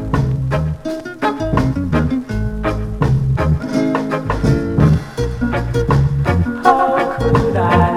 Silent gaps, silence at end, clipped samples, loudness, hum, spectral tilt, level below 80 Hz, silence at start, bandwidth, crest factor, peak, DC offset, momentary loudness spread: none; 0 s; under 0.1%; -17 LUFS; none; -8 dB/octave; -26 dBFS; 0 s; 12.5 kHz; 16 dB; 0 dBFS; under 0.1%; 7 LU